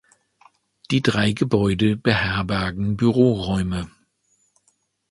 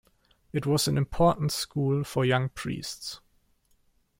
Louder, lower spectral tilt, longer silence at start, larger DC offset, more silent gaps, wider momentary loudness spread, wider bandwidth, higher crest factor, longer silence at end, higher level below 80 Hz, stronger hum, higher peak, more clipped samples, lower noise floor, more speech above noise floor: first, -21 LUFS vs -27 LUFS; about the same, -6.5 dB/octave vs -5.5 dB/octave; first, 0.9 s vs 0.55 s; neither; neither; second, 6 LU vs 12 LU; second, 11.5 kHz vs 16.5 kHz; about the same, 22 dB vs 18 dB; first, 1.2 s vs 1.05 s; first, -42 dBFS vs -50 dBFS; neither; first, 0 dBFS vs -10 dBFS; neither; about the same, -67 dBFS vs -67 dBFS; first, 47 dB vs 40 dB